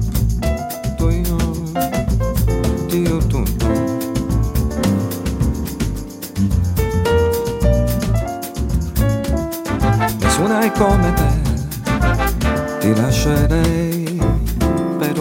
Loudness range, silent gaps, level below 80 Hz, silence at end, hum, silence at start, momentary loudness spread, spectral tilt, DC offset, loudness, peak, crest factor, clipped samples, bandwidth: 3 LU; none; -22 dBFS; 0 s; none; 0 s; 6 LU; -6 dB/octave; under 0.1%; -18 LUFS; -2 dBFS; 16 dB; under 0.1%; 16.5 kHz